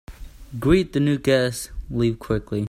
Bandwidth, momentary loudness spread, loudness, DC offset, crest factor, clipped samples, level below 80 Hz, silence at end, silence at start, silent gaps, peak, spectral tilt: 16 kHz; 11 LU; -22 LUFS; under 0.1%; 18 dB; under 0.1%; -38 dBFS; 0.05 s; 0.1 s; none; -4 dBFS; -6 dB/octave